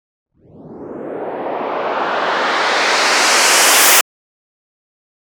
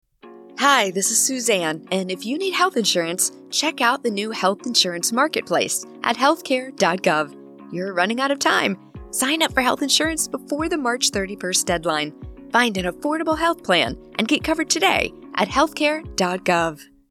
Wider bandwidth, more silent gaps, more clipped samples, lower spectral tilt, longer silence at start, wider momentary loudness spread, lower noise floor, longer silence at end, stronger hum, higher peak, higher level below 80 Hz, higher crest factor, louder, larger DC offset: first, over 20 kHz vs 17.5 kHz; neither; neither; second, 0.5 dB/octave vs -2 dB/octave; first, 0.55 s vs 0.25 s; first, 18 LU vs 7 LU; second, -38 dBFS vs -44 dBFS; first, 1.35 s vs 0.25 s; neither; first, 0 dBFS vs -4 dBFS; second, -68 dBFS vs -48 dBFS; about the same, 16 dB vs 18 dB; first, -12 LUFS vs -20 LUFS; neither